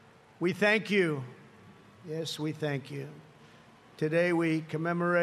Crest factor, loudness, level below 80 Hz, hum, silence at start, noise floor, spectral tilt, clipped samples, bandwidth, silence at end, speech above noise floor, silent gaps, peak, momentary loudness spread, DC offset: 18 dB; -30 LUFS; -78 dBFS; none; 0.4 s; -56 dBFS; -6 dB/octave; under 0.1%; 13 kHz; 0 s; 27 dB; none; -12 dBFS; 16 LU; under 0.1%